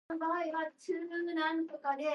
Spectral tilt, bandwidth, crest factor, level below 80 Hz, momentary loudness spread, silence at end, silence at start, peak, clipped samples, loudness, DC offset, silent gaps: -3.5 dB/octave; 11 kHz; 14 dB; -86 dBFS; 5 LU; 0 s; 0.1 s; -22 dBFS; under 0.1%; -36 LUFS; under 0.1%; none